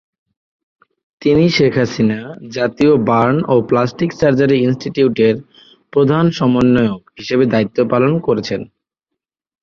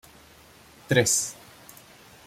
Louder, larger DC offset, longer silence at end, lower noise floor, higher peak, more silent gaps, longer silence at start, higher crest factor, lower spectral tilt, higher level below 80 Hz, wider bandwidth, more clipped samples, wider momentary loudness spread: first, -15 LUFS vs -23 LUFS; neither; about the same, 0.95 s vs 0.95 s; first, -80 dBFS vs -52 dBFS; first, -2 dBFS vs -6 dBFS; neither; first, 1.2 s vs 0.9 s; second, 14 dB vs 24 dB; first, -7 dB/octave vs -3 dB/octave; first, -48 dBFS vs -62 dBFS; second, 7.2 kHz vs 16.5 kHz; neither; second, 8 LU vs 26 LU